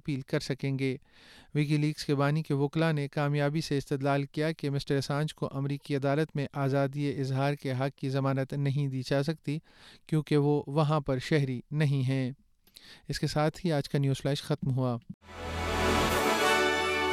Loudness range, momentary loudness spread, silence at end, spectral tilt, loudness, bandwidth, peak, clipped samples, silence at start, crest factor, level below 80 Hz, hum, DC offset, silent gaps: 2 LU; 7 LU; 0 s; -6 dB/octave; -30 LUFS; 15.5 kHz; -14 dBFS; under 0.1%; 0.05 s; 16 dB; -54 dBFS; none; under 0.1%; 15.14-15.21 s